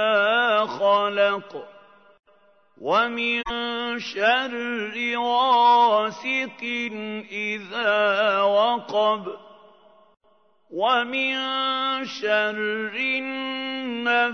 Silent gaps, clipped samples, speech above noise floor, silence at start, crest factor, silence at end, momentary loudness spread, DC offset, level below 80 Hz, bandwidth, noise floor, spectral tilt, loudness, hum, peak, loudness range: none; under 0.1%; 39 dB; 0 s; 18 dB; 0 s; 9 LU; under 0.1%; -60 dBFS; 6.6 kHz; -62 dBFS; -3.5 dB/octave; -22 LUFS; none; -6 dBFS; 4 LU